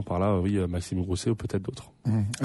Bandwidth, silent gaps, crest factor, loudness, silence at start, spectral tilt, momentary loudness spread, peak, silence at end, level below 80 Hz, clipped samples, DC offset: 11.5 kHz; none; 14 dB; -29 LUFS; 0 s; -7 dB/octave; 8 LU; -14 dBFS; 0 s; -48 dBFS; under 0.1%; under 0.1%